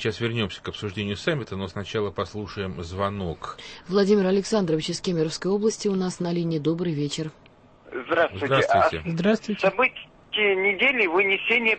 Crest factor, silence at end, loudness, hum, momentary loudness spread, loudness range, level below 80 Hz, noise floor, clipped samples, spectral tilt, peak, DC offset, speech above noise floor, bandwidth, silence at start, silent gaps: 16 dB; 0 s; -24 LUFS; none; 12 LU; 7 LU; -54 dBFS; -48 dBFS; under 0.1%; -5 dB/octave; -8 dBFS; under 0.1%; 24 dB; 8.8 kHz; 0 s; none